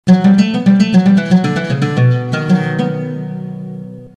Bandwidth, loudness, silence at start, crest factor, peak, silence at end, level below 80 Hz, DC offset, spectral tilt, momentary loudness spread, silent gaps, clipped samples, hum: 8.6 kHz; -13 LUFS; 0.05 s; 12 dB; 0 dBFS; 0.1 s; -50 dBFS; under 0.1%; -7.5 dB/octave; 15 LU; none; under 0.1%; none